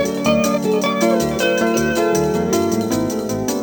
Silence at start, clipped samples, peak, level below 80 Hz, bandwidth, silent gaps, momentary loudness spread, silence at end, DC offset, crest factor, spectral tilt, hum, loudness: 0 s; under 0.1%; -2 dBFS; -44 dBFS; over 20 kHz; none; 4 LU; 0 s; under 0.1%; 14 dB; -4.5 dB/octave; none; -18 LUFS